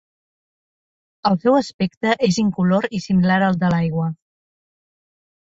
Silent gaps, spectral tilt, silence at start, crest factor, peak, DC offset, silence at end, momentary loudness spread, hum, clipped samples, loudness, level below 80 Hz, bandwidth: 1.74-1.79 s, 1.97-2.01 s; -6.5 dB/octave; 1.25 s; 18 dB; -4 dBFS; under 0.1%; 1.45 s; 8 LU; none; under 0.1%; -19 LUFS; -54 dBFS; 7.8 kHz